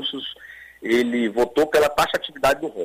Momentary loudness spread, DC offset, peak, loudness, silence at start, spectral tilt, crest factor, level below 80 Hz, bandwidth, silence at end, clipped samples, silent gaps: 15 LU; under 0.1%; -8 dBFS; -21 LUFS; 0 s; -3.5 dB/octave; 14 dB; -50 dBFS; 16 kHz; 0 s; under 0.1%; none